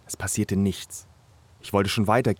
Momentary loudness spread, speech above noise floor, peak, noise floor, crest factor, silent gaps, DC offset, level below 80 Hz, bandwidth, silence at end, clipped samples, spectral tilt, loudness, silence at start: 18 LU; 30 dB; -6 dBFS; -55 dBFS; 18 dB; none; under 0.1%; -54 dBFS; 17.5 kHz; 0.05 s; under 0.1%; -5 dB/octave; -25 LUFS; 0.1 s